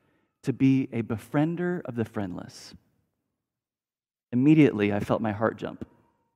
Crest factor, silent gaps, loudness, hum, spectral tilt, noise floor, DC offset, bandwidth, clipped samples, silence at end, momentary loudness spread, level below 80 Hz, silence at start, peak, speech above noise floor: 20 dB; none; -26 LUFS; none; -8 dB/octave; under -90 dBFS; under 0.1%; 12.5 kHz; under 0.1%; 0.5 s; 19 LU; -64 dBFS; 0.45 s; -8 dBFS; over 65 dB